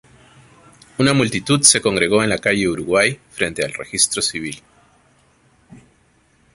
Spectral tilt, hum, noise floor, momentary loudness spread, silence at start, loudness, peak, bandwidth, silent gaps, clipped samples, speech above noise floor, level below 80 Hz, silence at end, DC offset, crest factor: -3 dB/octave; none; -57 dBFS; 13 LU; 1 s; -17 LUFS; 0 dBFS; 16 kHz; none; under 0.1%; 40 dB; -50 dBFS; 0.8 s; under 0.1%; 20 dB